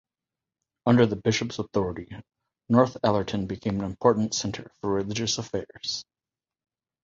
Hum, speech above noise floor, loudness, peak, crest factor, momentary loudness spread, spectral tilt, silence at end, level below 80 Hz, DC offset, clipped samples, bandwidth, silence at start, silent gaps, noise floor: none; over 65 dB; -26 LUFS; -4 dBFS; 24 dB; 12 LU; -5 dB/octave; 1 s; -54 dBFS; under 0.1%; under 0.1%; 7.6 kHz; 0.85 s; none; under -90 dBFS